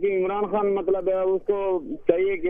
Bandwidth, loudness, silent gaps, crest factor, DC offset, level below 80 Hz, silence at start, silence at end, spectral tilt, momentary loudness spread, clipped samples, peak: 3.6 kHz; -24 LUFS; none; 20 dB; under 0.1%; -50 dBFS; 0 s; 0 s; -9.5 dB/octave; 2 LU; under 0.1%; -4 dBFS